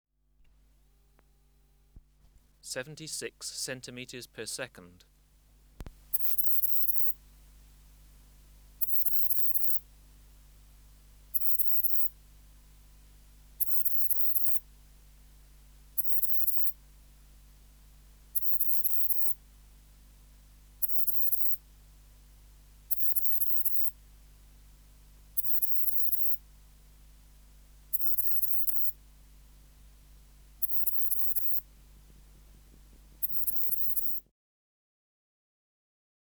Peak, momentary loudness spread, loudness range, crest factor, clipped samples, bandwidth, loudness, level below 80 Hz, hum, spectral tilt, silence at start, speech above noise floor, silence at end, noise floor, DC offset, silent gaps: -6 dBFS; 15 LU; 9 LU; 26 dB; under 0.1%; over 20 kHz; -25 LUFS; -56 dBFS; none; -1.5 dB/octave; 1.95 s; 24 dB; 2.05 s; -64 dBFS; under 0.1%; none